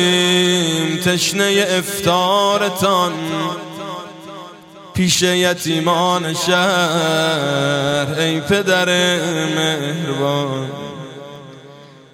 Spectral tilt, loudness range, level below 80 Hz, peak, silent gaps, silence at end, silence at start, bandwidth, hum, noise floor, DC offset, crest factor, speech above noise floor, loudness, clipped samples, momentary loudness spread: -3.5 dB/octave; 3 LU; -56 dBFS; 0 dBFS; none; 0.25 s; 0 s; 16.5 kHz; none; -40 dBFS; under 0.1%; 16 dB; 24 dB; -16 LUFS; under 0.1%; 16 LU